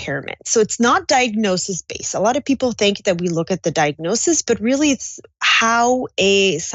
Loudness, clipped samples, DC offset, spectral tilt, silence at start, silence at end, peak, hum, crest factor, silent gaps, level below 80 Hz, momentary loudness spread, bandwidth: -17 LUFS; under 0.1%; under 0.1%; -3 dB/octave; 0 s; 0 s; -4 dBFS; none; 14 dB; none; -54 dBFS; 9 LU; 8.4 kHz